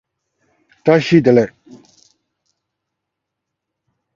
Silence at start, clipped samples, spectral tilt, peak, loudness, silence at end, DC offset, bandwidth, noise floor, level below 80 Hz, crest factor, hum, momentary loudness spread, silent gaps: 0.85 s; under 0.1%; -7.5 dB/octave; 0 dBFS; -14 LUFS; 2.65 s; under 0.1%; 7.4 kHz; -79 dBFS; -58 dBFS; 20 dB; none; 10 LU; none